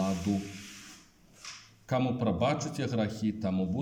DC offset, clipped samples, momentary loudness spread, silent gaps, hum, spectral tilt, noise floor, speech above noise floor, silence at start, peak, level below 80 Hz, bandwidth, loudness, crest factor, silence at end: under 0.1%; under 0.1%; 18 LU; none; none; -6.5 dB/octave; -57 dBFS; 27 dB; 0 s; -14 dBFS; -62 dBFS; 16 kHz; -31 LUFS; 18 dB; 0 s